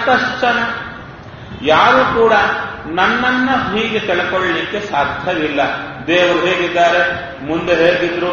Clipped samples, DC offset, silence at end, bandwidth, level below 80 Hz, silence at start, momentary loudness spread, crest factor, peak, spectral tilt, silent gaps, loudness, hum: under 0.1%; under 0.1%; 0 s; 7 kHz; -44 dBFS; 0 s; 10 LU; 14 dB; 0 dBFS; -2 dB/octave; none; -14 LUFS; none